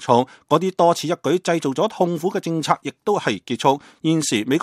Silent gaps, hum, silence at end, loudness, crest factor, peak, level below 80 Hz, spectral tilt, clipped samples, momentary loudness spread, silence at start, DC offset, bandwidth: none; none; 0 s; -20 LUFS; 20 dB; 0 dBFS; -68 dBFS; -5 dB/octave; under 0.1%; 5 LU; 0 s; under 0.1%; 14.5 kHz